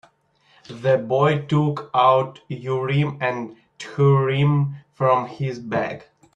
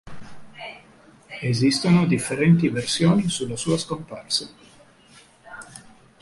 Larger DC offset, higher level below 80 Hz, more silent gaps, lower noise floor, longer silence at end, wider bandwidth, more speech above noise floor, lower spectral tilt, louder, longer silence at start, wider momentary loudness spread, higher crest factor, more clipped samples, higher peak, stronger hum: neither; second, -60 dBFS vs -54 dBFS; neither; first, -60 dBFS vs -52 dBFS; about the same, 0.35 s vs 0.4 s; second, 7.8 kHz vs 11.5 kHz; first, 40 dB vs 31 dB; first, -8 dB/octave vs -5.5 dB/octave; about the same, -21 LUFS vs -21 LUFS; first, 0.7 s vs 0.05 s; second, 14 LU vs 22 LU; about the same, 16 dB vs 18 dB; neither; about the same, -4 dBFS vs -6 dBFS; neither